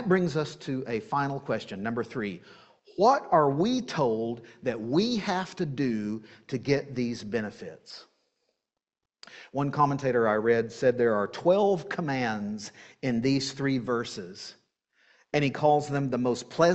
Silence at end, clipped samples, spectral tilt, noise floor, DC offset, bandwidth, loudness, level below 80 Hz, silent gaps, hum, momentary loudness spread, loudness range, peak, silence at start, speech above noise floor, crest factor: 0 s; under 0.1%; -6 dB/octave; -88 dBFS; under 0.1%; 8.4 kHz; -28 LUFS; -64 dBFS; none; none; 15 LU; 7 LU; -8 dBFS; 0 s; 61 dB; 20 dB